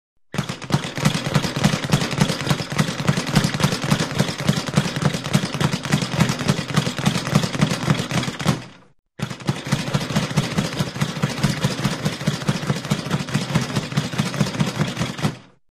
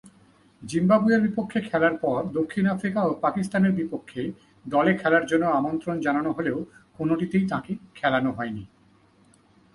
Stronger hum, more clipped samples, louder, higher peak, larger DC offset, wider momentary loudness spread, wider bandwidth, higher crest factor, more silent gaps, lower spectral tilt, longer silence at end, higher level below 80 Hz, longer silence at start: neither; neither; about the same, -22 LUFS vs -24 LUFS; first, -2 dBFS vs -6 dBFS; neither; second, 5 LU vs 12 LU; first, 15 kHz vs 11.5 kHz; about the same, 20 dB vs 18 dB; first, 8.99-9.03 s vs none; second, -5 dB/octave vs -7 dB/octave; second, 0.25 s vs 1.1 s; first, -44 dBFS vs -60 dBFS; first, 0.35 s vs 0.05 s